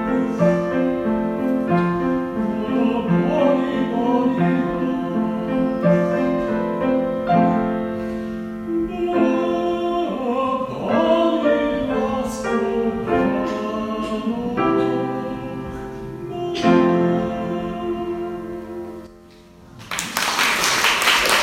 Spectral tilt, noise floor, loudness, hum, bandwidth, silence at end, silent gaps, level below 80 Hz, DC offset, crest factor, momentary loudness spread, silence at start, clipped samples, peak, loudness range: -5 dB/octave; -45 dBFS; -20 LUFS; none; 16 kHz; 0 s; none; -46 dBFS; under 0.1%; 20 dB; 11 LU; 0 s; under 0.1%; 0 dBFS; 3 LU